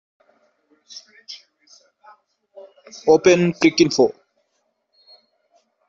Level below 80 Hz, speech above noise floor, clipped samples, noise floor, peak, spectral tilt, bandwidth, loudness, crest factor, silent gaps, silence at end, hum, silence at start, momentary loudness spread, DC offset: -64 dBFS; 52 dB; under 0.1%; -71 dBFS; -2 dBFS; -5 dB/octave; 7.6 kHz; -17 LUFS; 20 dB; none; 1.75 s; none; 1.3 s; 26 LU; under 0.1%